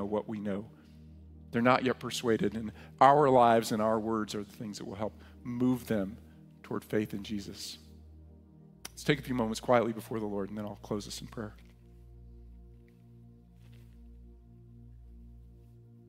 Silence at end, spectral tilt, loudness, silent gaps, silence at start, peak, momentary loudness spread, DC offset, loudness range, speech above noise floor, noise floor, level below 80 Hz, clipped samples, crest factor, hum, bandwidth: 0.6 s; -5.5 dB/octave; -31 LUFS; none; 0 s; -8 dBFS; 19 LU; under 0.1%; 15 LU; 26 dB; -56 dBFS; -56 dBFS; under 0.1%; 24 dB; none; 16 kHz